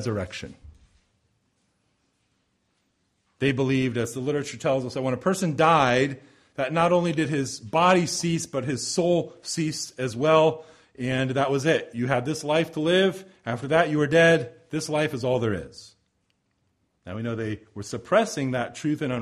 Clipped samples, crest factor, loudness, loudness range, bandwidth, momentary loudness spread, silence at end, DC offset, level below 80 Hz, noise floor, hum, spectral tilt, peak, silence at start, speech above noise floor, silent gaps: under 0.1%; 20 dB; -24 LUFS; 7 LU; 14 kHz; 13 LU; 0 s; under 0.1%; -60 dBFS; -72 dBFS; none; -5 dB/octave; -6 dBFS; 0 s; 48 dB; none